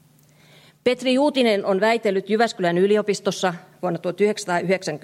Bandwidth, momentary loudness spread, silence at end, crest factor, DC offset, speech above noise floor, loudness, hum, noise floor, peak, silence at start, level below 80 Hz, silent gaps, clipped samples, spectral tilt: 13.5 kHz; 7 LU; 0.05 s; 16 dB; under 0.1%; 33 dB; -21 LUFS; none; -54 dBFS; -6 dBFS; 0.85 s; -72 dBFS; none; under 0.1%; -5 dB/octave